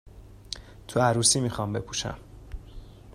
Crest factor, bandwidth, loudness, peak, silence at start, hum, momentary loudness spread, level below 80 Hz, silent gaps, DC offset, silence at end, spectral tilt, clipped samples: 22 dB; 15 kHz; -25 LUFS; -8 dBFS; 0.05 s; none; 24 LU; -46 dBFS; none; under 0.1%; 0.05 s; -3.5 dB/octave; under 0.1%